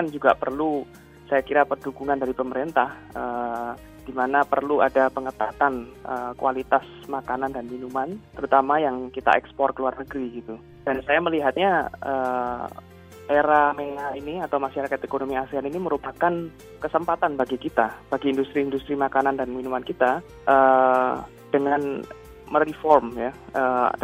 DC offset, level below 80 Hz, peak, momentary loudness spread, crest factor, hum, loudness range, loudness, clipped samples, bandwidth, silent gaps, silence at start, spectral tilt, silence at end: under 0.1%; -54 dBFS; -2 dBFS; 13 LU; 22 dB; none; 4 LU; -24 LUFS; under 0.1%; 16 kHz; none; 0 s; -6.5 dB/octave; 0 s